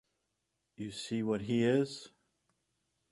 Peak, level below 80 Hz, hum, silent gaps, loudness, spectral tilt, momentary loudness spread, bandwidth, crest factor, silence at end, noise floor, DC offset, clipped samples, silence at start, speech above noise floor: -18 dBFS; -70 dBFS; none; none; -34 LUFS; -6 dB/octave; 15 LU; 11.5 kHz; 20 dB; 1.05 s; -84 dBFS; under 0.1%; under 0.1%; 0.8 s; 51 dB